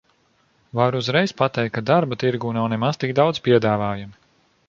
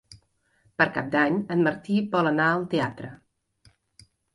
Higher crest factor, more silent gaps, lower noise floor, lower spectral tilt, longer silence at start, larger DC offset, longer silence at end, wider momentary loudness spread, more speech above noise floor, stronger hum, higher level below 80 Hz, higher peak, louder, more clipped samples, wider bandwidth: about the same, 18 dB vs 20 dB; neither; second, -62 dBFS vs -66 dBFS; about the same, -6.5 dB/octave vs -7 dB/octave; first, 0.75 s vs 0.1 s; neither; second, 0.55 s vs 1.2 s; second, 7 LU vs 13 LU; about the same, 42 dB vs 42 dB; neither; first, -56 dBFS vs -64 dBFS; first, -2 dBFS vs -8 dBFS; first, -21 LUFS vs -24 LUFS; neither; second, 7.4 kHz vs 11.5 kHz